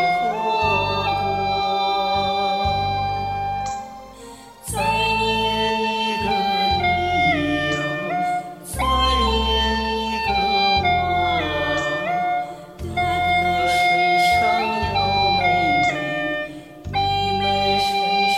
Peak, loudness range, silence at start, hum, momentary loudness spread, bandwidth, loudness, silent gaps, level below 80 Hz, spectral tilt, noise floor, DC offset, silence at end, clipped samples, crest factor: -8 dBFS; 4 LU; 0 s; none; 10 LU; 16 kHz; -20 LUFS; none; -36 dBFS; -4 dB/octave; -40 dBFS; under 0.1%; 0 s; under 0.1%; 14 dB